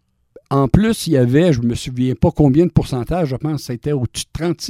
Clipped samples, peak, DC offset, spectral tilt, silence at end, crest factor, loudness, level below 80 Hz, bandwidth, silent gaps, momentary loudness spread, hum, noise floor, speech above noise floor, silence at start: under 0.1%; 0 dBFS; under 0.1%; -7 dB/octave; 0 s; 16 dB; -17 LUFS; -34 dBFS; 15.5 kHz; none; 9 LU; none; -48 dBFS; 32 dB; 0.5 s